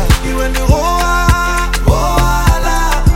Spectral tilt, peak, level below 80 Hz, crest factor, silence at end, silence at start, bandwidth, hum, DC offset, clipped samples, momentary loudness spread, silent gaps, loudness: -5 dB/octave; 0 dBFS; -14 dBFS; 10 dB; 0 s; 0 s; 17 kHz; none; under 0.1%; under 0.1%; 3 LU; none; -13 LUFS